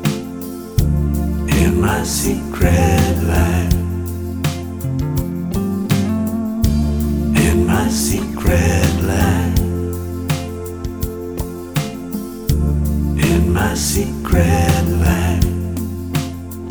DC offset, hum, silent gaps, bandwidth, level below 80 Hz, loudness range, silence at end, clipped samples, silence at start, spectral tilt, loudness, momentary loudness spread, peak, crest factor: under 0.1%; none; none; over 20 kHz; -24 dBFS; 4 LU; 0 s; under 0.1%; 0 s; -5.5 dB/octave; -18 LUFS; 10 LU; 0 dBFS; 16 dB